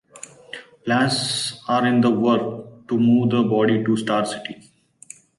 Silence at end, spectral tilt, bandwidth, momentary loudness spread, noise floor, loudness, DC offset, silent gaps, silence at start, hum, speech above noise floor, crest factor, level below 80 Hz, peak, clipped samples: 0.85 s; -5 dB/octave; 11.5 kHz; 19 LU; -46 dBFS; -20 LUFS; under 0.1%; none; 0.15 s; none; 27 dB; 14 dB; -62 dBFS; -8 dBFS; under 0.1%